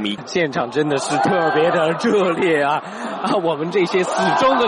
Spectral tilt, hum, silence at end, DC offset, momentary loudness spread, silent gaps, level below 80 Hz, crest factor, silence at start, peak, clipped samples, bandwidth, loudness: -5 dB/octave; none; 0 s; under 0.1%; 5 LU; none; -60 dBFS; 12 dB; 0 s; -6 dBFS; under 0.1%; 11 kHz; -18 LUFS